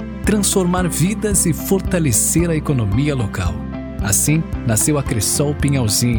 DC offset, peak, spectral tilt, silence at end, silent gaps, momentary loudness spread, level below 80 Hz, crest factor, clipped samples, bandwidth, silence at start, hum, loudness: under 0.1%; -4 dBFS; -4.5 dB/octave; 0 s; none; 6 LU; -30 dBFS; 12 dB; under 0.1%; 19 kHz; 0 s; none; -17 LUFS